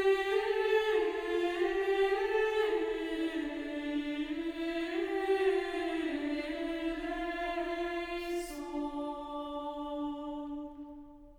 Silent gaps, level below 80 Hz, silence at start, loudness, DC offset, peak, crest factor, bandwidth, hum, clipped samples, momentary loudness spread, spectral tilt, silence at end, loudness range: none; -56 dBFS; 0 s; -34 LUFS; under 0.1%; -18 dBFS; 16 dB; 18.5 kHz; none; under 0.1%; 10 LU; -4 dB/octave; 0.05 s; 6 LU